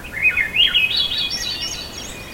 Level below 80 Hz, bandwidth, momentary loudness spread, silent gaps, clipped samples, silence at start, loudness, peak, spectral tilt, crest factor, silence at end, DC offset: -42 dBFS; 16.5 kHz; 14 LU; none; under 0.1%; 0 s; -17 LUFS; -4 dBFS; -0.5 dB/octave; 16 dB; 0 s; under 0.1%